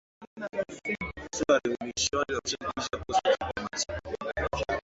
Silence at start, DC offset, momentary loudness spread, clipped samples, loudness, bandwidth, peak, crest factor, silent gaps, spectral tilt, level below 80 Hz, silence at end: 0.2 s; under 0.1%; 9 LU; under 0.1%; -30 LUFS; 8 kHz; -10 dBFS; 20 dB; 0.27-0.36 s; -3 dB/octave; -48 dBFS; 0.05 s